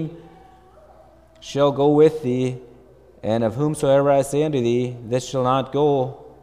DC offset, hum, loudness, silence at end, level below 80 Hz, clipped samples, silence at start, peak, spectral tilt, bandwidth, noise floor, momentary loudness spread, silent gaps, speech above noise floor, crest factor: under 0.1%; none; -20 LUFS; 0.15 s; -54 dBFS; under 0.1%; 0 s; -4 dBFS; -6.5 dB/octave; 14.5 kHz; -50 dBFS; 13 LU; none; 31 dB; 16 dB